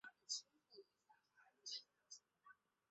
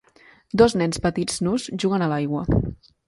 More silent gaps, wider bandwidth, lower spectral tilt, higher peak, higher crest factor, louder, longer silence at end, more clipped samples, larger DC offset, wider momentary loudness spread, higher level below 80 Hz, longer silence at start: neither; second, 8 kHz vs 11.5 kHz; second, 3.5 dB/octave vs -6 dB/octave; second, -34 dBFS vs -2 dBFS; first, 26 dB vs 20 dB; second, -52 LUFS vs -22 LUFS; about the same, 0.35 s vs 0.35 s; neither; neither; first, 18 LU vs 7 LU; second, under -90 dBFS vs -38 dBFS; second, 0.05 s vs 0.55 s